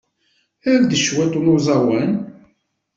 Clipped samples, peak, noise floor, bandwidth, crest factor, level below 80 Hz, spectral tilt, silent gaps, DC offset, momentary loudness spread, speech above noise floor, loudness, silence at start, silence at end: under 0.1%; -4 dBFS; -65 dBFS; 7.8 kHz; 14 dB; -54 dBFS; -5 dB/octave; none; under 0.1%; 10 LU; 49 dB; -17 LUFS; 0.65 s; 0.7 s